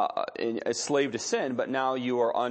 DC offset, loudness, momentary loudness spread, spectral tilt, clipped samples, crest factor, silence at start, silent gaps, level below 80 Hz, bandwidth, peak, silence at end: under 0.1%; -29 LUFS; 4 LU; -3.5 dB/octave; under 0.1%; 16 dB; 0 s; none; -76 dBFS; 8.8 kHz; -12 dBFS; 0 s